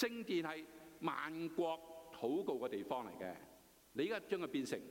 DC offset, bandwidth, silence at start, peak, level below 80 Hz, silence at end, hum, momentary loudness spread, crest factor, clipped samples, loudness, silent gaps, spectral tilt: under 0.1%; 16.5 kHz; 0 s; -24 dBFS; -78 dBFS; 0 s; none; 10 LU; 18 dB; under 0.1%; -43 LUFS; none; -5 dB/octave